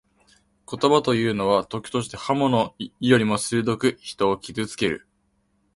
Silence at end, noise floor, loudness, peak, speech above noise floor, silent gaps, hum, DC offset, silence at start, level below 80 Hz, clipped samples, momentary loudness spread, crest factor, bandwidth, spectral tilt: 0.8 s; -68 dBFS; -23 LUFS; -2 dBFS; 46 dB; none; none; under 0.1%; 0.7 s; -56 dBFS; under 0.1%; 9 LU; 22 dB; 11.5 kHz; -5 dB/octave